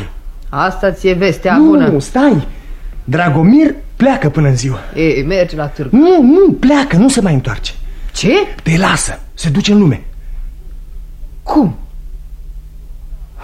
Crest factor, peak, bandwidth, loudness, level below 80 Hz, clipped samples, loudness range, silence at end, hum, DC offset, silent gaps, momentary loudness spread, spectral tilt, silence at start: 12 dB; 0 dBFS; 13.5 kHz; -11 LUFS; -26 dBFS; under 0.1%; 6 LU; 0 s; none; under 0.1%; none; 20 LU; -6 dB/octave; 0 s